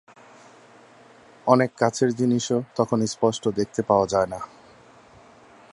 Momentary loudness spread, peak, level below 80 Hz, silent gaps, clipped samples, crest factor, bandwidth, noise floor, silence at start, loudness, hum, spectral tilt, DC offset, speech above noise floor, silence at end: 8 LU; -2 dBFS; -58 dBFS; none; under 0.1%; 22 dB; 11.5 kHz; -51 dBFS; 1.45 s; -23 LUFS; none; -5.5 dB/octave; under 0.1%; 29 dB; 1.3 s